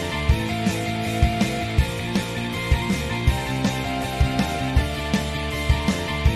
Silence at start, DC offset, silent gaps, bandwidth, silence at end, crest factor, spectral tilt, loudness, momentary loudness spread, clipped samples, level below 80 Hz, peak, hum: 0 s; under 0.1%; none; 14 kHz; 0 s; 18 dB; -5.5 dB/octave; -23 LUFS; 3 LU; under 0.1%; -28 dBFS; -4 dBFS; none